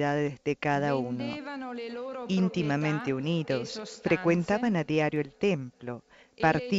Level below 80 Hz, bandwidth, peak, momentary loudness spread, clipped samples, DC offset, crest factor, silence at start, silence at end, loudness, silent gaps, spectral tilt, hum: -62 dBFS; 8 kHz; -8 dBFS; 11 LU; under 0.1%; under 0.1%; 20 dB; 0 s; 0 s; -29 LUFS; none; -6.5 dB/octave; none